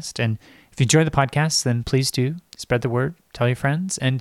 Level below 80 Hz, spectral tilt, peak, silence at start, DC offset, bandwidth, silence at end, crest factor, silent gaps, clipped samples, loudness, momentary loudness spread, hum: -46 dBFS; -4.5 dB/octave; -4 dBFS; 0 s; under 0.1%; 14 kHz; 0 s; 16 dB; none; under 0.1%; -21 LUFS; 8 LU; none